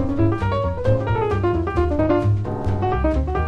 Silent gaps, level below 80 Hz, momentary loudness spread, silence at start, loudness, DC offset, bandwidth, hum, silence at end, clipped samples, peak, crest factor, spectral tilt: none; -28 dBFS; 3 LU; 0 s; -21 LUFS; under 0.1%; 6.8 kHz; none; 0 s; under 0.1%; -6 dBFS; 12 dB; -9.5 dB/octave